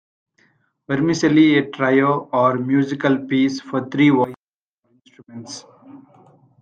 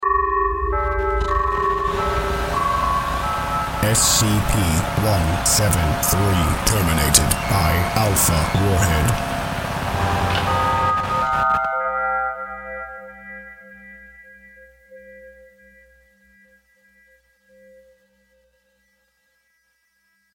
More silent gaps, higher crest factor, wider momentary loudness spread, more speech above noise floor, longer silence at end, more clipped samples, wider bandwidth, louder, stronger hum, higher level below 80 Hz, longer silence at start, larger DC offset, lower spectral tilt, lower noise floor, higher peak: first, 4.37-4.47 s, 4.55-4.82 s vs none; second, 16 dB vs 22 dB; first, 19 LU vs 14 LU; first, 60 dB vs 48 dB; second, 0.65 s vs 5.05 s; neither; second, 8.8 kHz vs 17 kHz; about the same, -18 LUFS vs -19 LUFS; neither; second, -64 dBFS vs -30 dBFS; first, 0.9 s vs 0 s; neither; first, -6 dB/octave vs -4 dB/octave; first, -77 dBFS vs -66 dBFS; second, -4 dBFS vs 0 dBFS